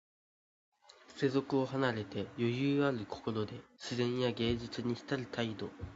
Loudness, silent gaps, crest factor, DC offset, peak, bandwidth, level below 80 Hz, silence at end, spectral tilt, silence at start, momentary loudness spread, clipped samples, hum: -36 LUFS; none; 20 dB; under 0.1%; -16 dBFS; 7.6 kHz; -60 dBFS; 0 s; -5 dB/octave; 1.1 s; 9 LU; under 0.1%; none